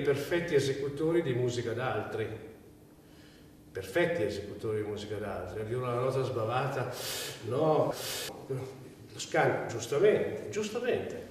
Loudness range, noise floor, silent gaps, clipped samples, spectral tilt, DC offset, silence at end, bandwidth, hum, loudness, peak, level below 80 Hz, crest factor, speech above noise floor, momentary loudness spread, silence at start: 5 LU; -55 dBFS; none; under 0.1%; -5 dB/octave; under 0.1%; 0 s; 15.5 kHz; none; -32 LUFS; -14 dBFS; -62 dBFS; 18 dB; 24 dB; 11 LU; 0 s